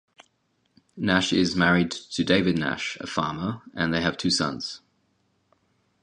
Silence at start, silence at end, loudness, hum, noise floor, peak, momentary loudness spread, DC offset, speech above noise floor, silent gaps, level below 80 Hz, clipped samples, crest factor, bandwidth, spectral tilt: 0.95 s; 1.25 s; -24 LUFS; none; -71 dBFS; -4 dBFS; 10 LU; under 0.1%; 46 dB; none; -52 dBFS; under 0.1%; 22 dB; 10.5 kHz; -4.5 dB/octave